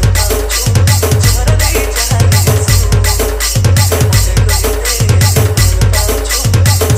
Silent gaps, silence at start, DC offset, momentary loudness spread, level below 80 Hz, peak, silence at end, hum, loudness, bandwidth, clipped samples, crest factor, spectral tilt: none; 0 s; under 0.1%; 3 LU; -16 dBFS; 0 dBFS; 0 s; none; -10 LUFS; 16.5 kHz; under 0.1%; 10 dB; -4 dB/octave